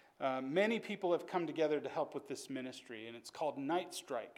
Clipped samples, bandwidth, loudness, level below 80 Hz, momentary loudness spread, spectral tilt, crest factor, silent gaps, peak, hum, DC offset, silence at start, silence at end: under 0.1%; 16.5 kHz; -39 LUFS; under -90 dBFS; 13 LU; -4.5 dB/octave; 18 dB; none; -20 dBFS; none; under 0.1%; 0.2 s; 0.05 s